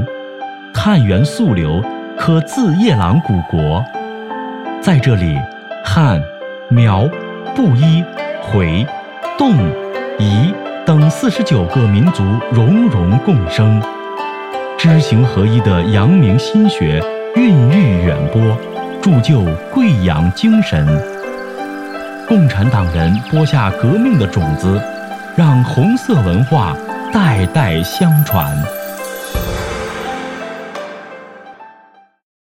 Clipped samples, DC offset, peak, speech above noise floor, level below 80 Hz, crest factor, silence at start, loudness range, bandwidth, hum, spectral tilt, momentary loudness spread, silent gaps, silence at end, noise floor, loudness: under 0.1%; under 0.1%; 0 dBFS; 35 dB; -34 dBFS; 12 dB; 0 s; 4 LU; 16 kHz; none; -7.5 dB/octave; 13 LU; none; 0.9 s; -46 dBFS; -13 LUFS